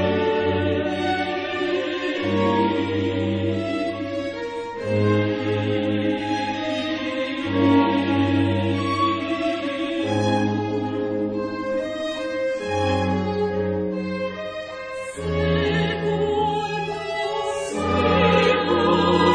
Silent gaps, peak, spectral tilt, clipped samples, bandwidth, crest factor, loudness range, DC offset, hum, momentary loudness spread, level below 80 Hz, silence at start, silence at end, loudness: none; -4 dBFS; -6.5 dB/octave; under 0.1%; 10 kHz; 18 dB; 3 LU; under 0.1%; none; 8 LU; -48 dBFS; 0 s; 0 s; -23 LUFS